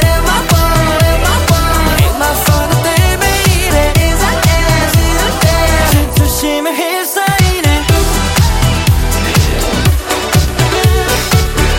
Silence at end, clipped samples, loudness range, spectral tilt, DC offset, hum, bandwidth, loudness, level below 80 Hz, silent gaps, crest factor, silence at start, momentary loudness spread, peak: 0 s; under 0.1%; 1 LU; -4.5 dB/octave; under 0.1%; none; 17 kHz; -11 LUFS; -16 dBFS; none; 10 dB; 0 s; 2 LU; 0 dBFS